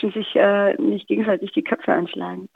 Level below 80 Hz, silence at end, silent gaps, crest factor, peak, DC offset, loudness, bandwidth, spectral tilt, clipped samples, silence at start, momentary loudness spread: -70 dBFS; 0.1 s; none; 18 dB; -4 dBFS; under 0.1%; -20 LUFS; 4.2 kHz; -8 dB/octave; under 0.1%; 0 s; 6 LU